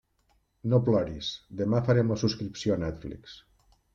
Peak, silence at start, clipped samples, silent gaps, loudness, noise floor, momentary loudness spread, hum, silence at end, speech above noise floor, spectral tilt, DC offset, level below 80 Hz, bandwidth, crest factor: -12 dBFS; 0.65 s; under 0.1%; none; -28 LUFS; -70 dBFS; 17 LU; none; 0.55 s; 43 dB; -7 dB/octave; under 0.1%; -54 dBFS; 7.6 kHz; 18 dB